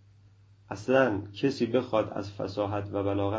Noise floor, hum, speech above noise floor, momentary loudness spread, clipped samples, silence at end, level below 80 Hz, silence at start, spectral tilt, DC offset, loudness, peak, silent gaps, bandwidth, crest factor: -57 dBFS; none; 29 dB; 10 LU; under 0.1%; 0 s; -54 dBFS; 0.7 s; -7 dB/octave; under 0.1%; -29 LUFS; -10 dBFS; none; 7.8 kHz; 20 dB